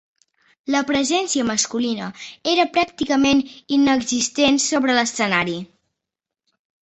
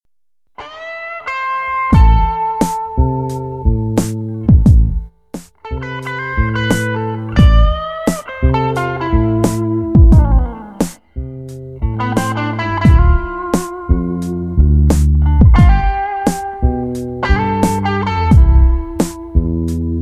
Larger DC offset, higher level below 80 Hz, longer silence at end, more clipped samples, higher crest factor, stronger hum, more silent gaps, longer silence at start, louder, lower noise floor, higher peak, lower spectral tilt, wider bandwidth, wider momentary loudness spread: second, under 0.1% vs 0.2%; second, -56 dBFS vs -16 dBFS; first, 1.2 s vs 0 s; neither; first, 18 dB vs 12 dB; neither; neither; about the same, 0.65 s vs 0.6 s; second, -19 LUFS vs -15 LUFS; first, -85 dBFS vs -70 dBFS; about the same, -2 dBFS vs 0 dBFS; second, -2.5 dB/octave vs -7 dB/octave; second, 8.4 kHz vs 14 kHz; second, 9 LU vs 14 LU